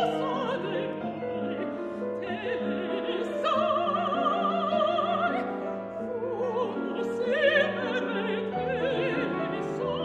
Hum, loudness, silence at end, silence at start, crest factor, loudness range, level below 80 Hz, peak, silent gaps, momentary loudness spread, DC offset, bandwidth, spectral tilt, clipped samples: none; -29 LUFS; 0 s; 0 s; 16 dB; 3 LU; -64 dBFS; -12 dBFS; none; 8 LU; under 0.1%; 9.6 kHz; -6.5 dB/octave; under 0.1%